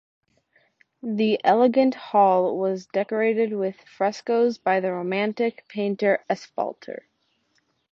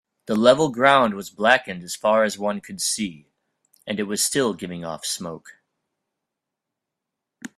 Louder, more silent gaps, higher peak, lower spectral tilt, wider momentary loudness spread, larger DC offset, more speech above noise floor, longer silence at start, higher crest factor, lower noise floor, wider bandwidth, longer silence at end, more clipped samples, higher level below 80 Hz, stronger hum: about the same, -23 LUFS vs -21 LUFS; neither; second, -4 dBFS vs 0 dBFS; first, -6.5 dB/octave vs -3 dB/octave; second, 11 LU vs 15 LU; neither; second, 47 dB vs 62 dB; first, 1.05 s vs 0.3 s; about the same, 20 dB vs 24 dB; second, -69 dBFS vs -84 dBFS; second, 7.4 kHz vs 15.5 kHz; first, 1 s vs 0.1 s; neither; second, -74 dBFS vs -64 dBFS; neither